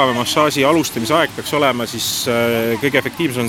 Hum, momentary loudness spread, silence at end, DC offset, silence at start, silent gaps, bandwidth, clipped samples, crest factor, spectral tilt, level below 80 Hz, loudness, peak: none; 4 LU; 0 s; under 0.1%; 0 s; none; 19 kHz; under 0.1%; 16 dB; -3.5 dB/octave; -50 dBFS; -16 LUFS; 0 dBFS